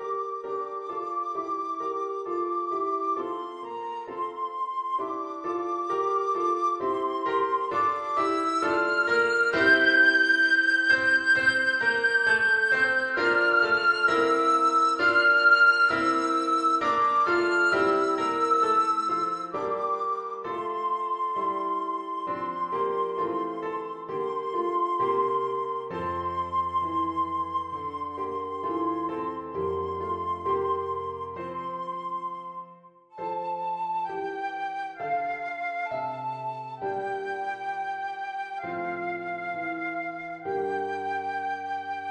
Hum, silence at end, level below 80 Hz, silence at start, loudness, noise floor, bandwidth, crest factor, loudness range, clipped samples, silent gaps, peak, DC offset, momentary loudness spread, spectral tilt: none; 0 s; -64 dBFS; 0 s; -26 LUFS; -52 dBFS; 10 kHz; 18 dB; 11 LU; under 0.1%; none; -10 dBFS; under 0.1%; 13 LU; -4 dB/octave